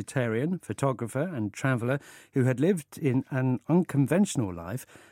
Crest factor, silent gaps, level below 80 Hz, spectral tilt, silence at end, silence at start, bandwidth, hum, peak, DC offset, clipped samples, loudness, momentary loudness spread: 18 dB; none; -64 dBFS; -7 dB/octave; 0.25 s; 0 s; 16 kHz; none; -10 dBFS; under 0.1%; under 0.1%; -28 LUFS; 9 LU